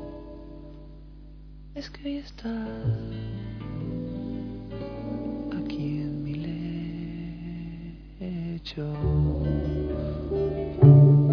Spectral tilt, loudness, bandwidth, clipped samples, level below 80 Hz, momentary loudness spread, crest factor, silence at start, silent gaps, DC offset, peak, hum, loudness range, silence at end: -10.5 dB/octave; -27 LUFS; 5.4 kHz; under 0.1%; -40 dBFS; 16 LU; 22 dB; 0 s; none; under 0.1%; -4 dBFS; none; 9 LU; 0 s